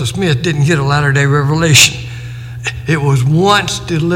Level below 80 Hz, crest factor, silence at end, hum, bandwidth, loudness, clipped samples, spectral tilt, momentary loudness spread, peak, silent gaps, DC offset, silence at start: -36 dBFS; 12 dB; 0 s; none; 17 kHz; -11 LUFS; 0.1%; -4 dB/octave; 16 LU; 0 dBFS; none; under 0.1%; 0 s